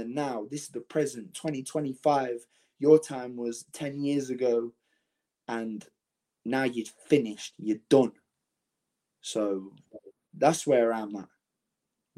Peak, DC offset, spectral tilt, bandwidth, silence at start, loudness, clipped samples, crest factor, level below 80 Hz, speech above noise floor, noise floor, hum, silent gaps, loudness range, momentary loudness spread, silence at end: -6 dBFS; under 0.1%; -5.5 dB/octave; 15 kHz; 0 s; -29 LUFS; under 0.1%; 22 dB; -78 dBFS; 58 dB; -86 dBFS; none; none; 4 LU; 15 LU; 0.9 s